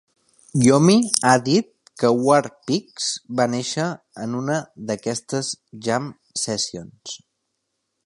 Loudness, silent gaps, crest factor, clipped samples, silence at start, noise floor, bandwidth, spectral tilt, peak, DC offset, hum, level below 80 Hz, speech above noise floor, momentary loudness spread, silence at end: -21 LUFS; none; 22 dB; under 0.1%; 0.55 s; -76 dBFS; 12 kHz; -4.5 dB/octave; 0 dBFS; under 0.1%; none; -64 dBFS; 55 dB; 14 LU; 0.9 s